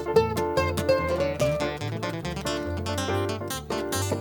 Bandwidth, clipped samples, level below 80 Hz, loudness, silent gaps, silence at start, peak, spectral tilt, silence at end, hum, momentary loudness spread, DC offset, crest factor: 19.5 kHz; under 0.1%; -44 dBFS; -27 LUFS; none; 0 s; -8 dBFS; -5 dB/octave; 0 s; none; 7 LU; under 0.1%; 18 dB